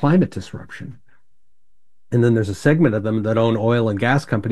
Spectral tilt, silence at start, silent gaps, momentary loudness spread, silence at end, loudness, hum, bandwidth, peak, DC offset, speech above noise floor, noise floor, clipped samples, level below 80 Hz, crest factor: -7.5 dB/octave; 0 s; none; 17 LU; 0 s; -18 LUFS; none; 12 kHz; -2 dBFS; 0.8%; 55 dB; -72 dBFS; under 0.1%; -52 dBFS; 18 dB